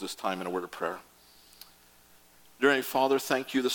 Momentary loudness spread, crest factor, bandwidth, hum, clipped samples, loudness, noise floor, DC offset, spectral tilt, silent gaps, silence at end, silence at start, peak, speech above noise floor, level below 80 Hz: 10 LU; 22 dB; 17.5 kHz; 60 Hz at -70 dBFS; under 0.1%; -29 LUFS; -59 dBFS; under 0.1%; -3.5 dB/octave; none; 0 s; 0 s; -8 dBFS; 30 dB; -74 dBFS